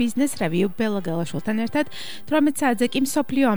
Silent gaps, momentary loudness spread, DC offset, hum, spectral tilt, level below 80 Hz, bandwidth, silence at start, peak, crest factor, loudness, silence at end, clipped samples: none; 6 LU; 2%; none; -5 dB/octave; -60 dBFS; over 20 kHz; 0 s; -8 dBFS; 14 dB; -23 LUFS; 0 s; under 0.1%